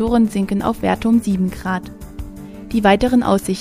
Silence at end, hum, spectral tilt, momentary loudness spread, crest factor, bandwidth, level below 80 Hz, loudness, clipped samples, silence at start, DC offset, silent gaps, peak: 0 s; none; -6.5 dB/octave; 19 LU; 16 dB; 15.5 kHz; -36 dBFS; -17 LUFS; under 0.1%; 0 s; under 0.1%; none; 0 dBFS